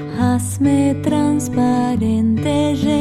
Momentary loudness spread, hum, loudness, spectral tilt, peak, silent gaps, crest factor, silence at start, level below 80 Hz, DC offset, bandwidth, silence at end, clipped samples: 2 LU; none; -17 LUFS; -6.5 dB/octave; -4 dBFS; none; 12 dB; 0 s; -44 dBFS; under 0.1%; 14.5 kHz; 0 s; under 0.1%